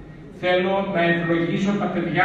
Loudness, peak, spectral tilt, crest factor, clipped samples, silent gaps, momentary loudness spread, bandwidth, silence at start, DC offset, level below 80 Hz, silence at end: -21 LUFS; -6 dBFS; -7 dB/octave; 16 dB; under 0.1%; none; 4 LU; 8 kHz; 0 s; under 0.1%; -50 dBFS; 0 s